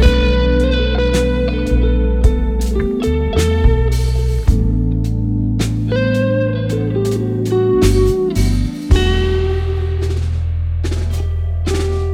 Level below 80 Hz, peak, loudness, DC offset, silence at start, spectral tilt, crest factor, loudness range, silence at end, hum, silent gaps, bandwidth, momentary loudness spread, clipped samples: -18 dBFS; 0 dBFS; -16 LUFS; under 0.1%; 0 s; -7 dB/octave; 14 dB; 2 LU; 0 s; none; none; 14.5 kHz; 6 LU; under 0.1%